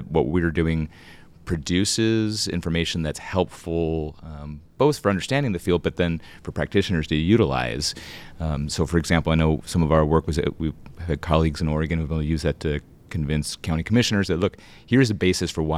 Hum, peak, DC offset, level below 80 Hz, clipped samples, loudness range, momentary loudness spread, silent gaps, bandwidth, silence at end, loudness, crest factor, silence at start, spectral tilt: none; -4 dBFS; under 0.1%; -36 dBFS; under 0.1%; 2 LU; 11 LU; none; 14.5 kHz; 0 s; -23 LUFS; 20 dB; 0 s; -5.5 dB/octave